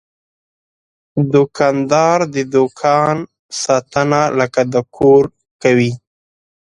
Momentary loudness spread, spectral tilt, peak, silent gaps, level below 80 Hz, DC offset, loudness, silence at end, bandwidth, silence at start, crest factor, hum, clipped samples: 10 LU; -5.5 dB/octave; 0 dBFS; 3.39-3.49 s, 5.51-5.60 s; -52 dBFS; under 0.1%; -15 LUFS; 0.7 s; 11 kHz; 1.15 s; 16 dB; none; under 0.1%